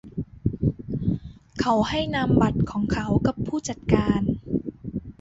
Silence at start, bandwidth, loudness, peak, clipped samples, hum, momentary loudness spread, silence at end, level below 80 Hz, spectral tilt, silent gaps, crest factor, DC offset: 0.05 s; 8 kHz; -25 LUFS; -2 dBFS; under 0.1%; none; 12 LU; 0.1 s; -40 dBFS; -6.5 dB/octave; none; 22 dB; under 0.1%